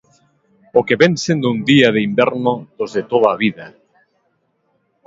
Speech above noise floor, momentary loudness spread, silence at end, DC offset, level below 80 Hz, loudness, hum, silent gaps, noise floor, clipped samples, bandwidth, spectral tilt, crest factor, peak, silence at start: 50 dB; 11 LU; 1.4 s; under 0.1%; -58 dBFS; -15 LUFS; none; none; -65 dBFS; under 0.1%; 7.8 kHz; -5.5 dB/octave; 18 dB; 0 dBFS; 0.75 s